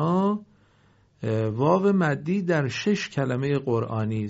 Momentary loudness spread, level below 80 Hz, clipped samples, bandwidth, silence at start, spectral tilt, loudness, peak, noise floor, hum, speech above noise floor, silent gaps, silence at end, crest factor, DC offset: 6 LU; -62 dBFS; under 0.1%; 8 kHz; 0 s; -6.5 dB/octave; -25 LUFS; -6 dBFS; -60 dBFS; none; 36 dB; none; 0 s; 18 dB; under 0.1%